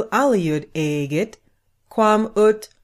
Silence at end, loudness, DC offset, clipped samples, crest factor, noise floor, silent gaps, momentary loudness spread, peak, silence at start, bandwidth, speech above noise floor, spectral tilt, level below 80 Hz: 0.2 s; -20 LUFS; under 0.1%; under 0.1%; 14 dB; -62 dBFS; none; 8 LU; -6 dBFS; 0 s; 15 kHz; 43 dB; -6 dB/octave; -56 dBFS